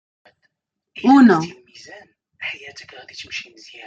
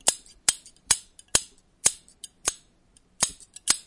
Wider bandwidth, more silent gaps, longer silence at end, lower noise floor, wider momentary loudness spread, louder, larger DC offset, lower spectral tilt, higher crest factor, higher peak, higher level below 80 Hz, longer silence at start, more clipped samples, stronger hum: second, 7.8 kHz vs 11.5 kHz; neither; first, 0.45 s vs 0.05 s; first, -72 dBFS vs -61 dBFS; first, 28 LU vs 17 LU; first, -17 LUFS vs -26 LUFS; neither; first, -6 dB/octave vs 1 dB/octave; second, 18 dB vs 28 dB; about the same, -2 dBFS vs -2 dBFS; second, -64 dBFS vs -56 dBFS; first, 1.05 s vs 0.05 s; neither; neither